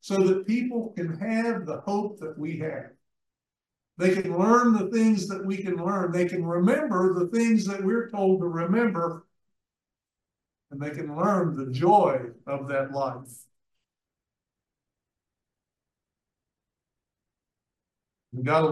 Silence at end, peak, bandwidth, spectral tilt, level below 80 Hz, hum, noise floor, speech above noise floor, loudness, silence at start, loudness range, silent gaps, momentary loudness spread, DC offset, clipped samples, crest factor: 0 s; -8 dBFS; 12.5 kHz; -7 dB/octave; -74 dBFS; none; under -90 dBFS; over 65 dB; -25 LUFS; 0.05 s; 8 LU; none; 13 LU; under 0.1%; under 0.1%; 20 dB